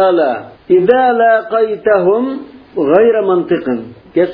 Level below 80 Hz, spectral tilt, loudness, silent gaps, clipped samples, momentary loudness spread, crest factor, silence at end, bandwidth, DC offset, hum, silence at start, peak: -54 dBFS; -10 dB/octave; -12 LUFS; none; under 0.1%; 11 LU; 12 dB; 0 s; 4.9 kHz; under 0.1%; none; 0 s; 0 dBFS